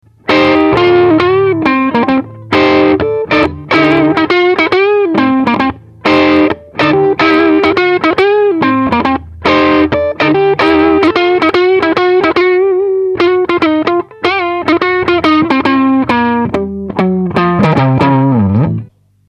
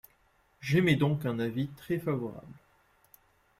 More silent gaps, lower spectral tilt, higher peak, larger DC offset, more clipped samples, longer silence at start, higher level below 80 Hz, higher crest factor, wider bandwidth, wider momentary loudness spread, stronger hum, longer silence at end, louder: neither; about the same, -7.5 dB/octave vs -7 dB/octave; first, 0 dBFS vs -12 dBFS; neither; neither; second, 0.25 s vs 0.6 s; first, -40 dBFS vs -64 dBFS; second, 10 dB vs 20 dB; second, 7.4 kHz vs 15.5 kHz; second, 5 LU vs 15 LU; neither; second, 0.45 s vs 1.05 s; first, -10 LUFS vs -30 LUFS